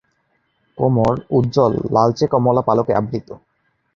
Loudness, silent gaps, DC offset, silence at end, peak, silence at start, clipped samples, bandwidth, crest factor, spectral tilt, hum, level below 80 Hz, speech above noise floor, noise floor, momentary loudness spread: -17 LUFS; none; under 0.1%; 0.6 s; -2 dBFS; 0.75 s; under 0.1%; 7.2 kHz; 16 dB; -8.5 dB/octave; none; -46 dBFS; 49 dB; -66 dBFS; 5 LU